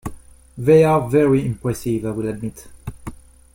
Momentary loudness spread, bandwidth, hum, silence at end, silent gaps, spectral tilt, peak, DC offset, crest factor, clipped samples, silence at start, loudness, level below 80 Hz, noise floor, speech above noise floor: 22 LU; 16.5 kHz; none; 0.4 s; none; -7.5 dB/octave; -2 dBFS; under 0.1%; 16 dB; under 0.1%; 0.05 s; -18 LUFS; -44 dBFS; -37 dBFS; 20 dB